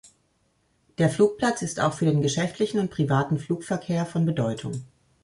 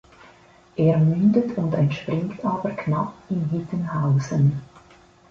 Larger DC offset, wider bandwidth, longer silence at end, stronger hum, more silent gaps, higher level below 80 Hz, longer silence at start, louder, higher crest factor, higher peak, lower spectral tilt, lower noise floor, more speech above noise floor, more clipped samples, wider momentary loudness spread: neither; first, 11.5 kHz vs 7.4 kHz; second, 0.4 s vs 0.65 s; neither; neither; about the same, -58 dBFS vs -54 dBFS; first, 1 s vs 0.75 s; second, -25 LUFS vs -22 LUFS; about the same, 18 dB vs 16 dB; about the same, -8 dBFS vs -6 dBFS; second, -6 dB/octave vs -9 dB/octave; first, -68 dBFS vs -52 dBFS; first, 44 dB vs 31 dB; neither; about the same, 7 LU vs 9 LU